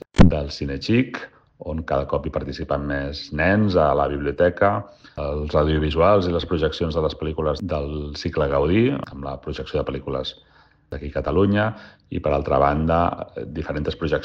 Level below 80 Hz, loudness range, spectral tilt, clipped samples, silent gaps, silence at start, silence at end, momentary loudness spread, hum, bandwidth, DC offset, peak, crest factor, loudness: -34 dBFS; 4 LU; -7.5 dB/octave; under 0.1%; none; 0.15 s; 0 s; 13 LU; none; 8.6 kHz; under 0.1%; -4 dBFS; 18 dB; -22 LUFS